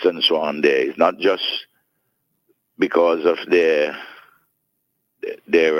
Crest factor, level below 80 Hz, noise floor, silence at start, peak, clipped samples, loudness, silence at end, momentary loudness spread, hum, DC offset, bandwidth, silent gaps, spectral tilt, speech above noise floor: 18 dB; -66 dBFS; -72 dBFS; 0 s; -2 dBFS; under 0.1%; -18 LUFS; 0 s; 16 LU; none; under 0.1%; 13 kHz; none; -4.5 dB/octave; 54 dB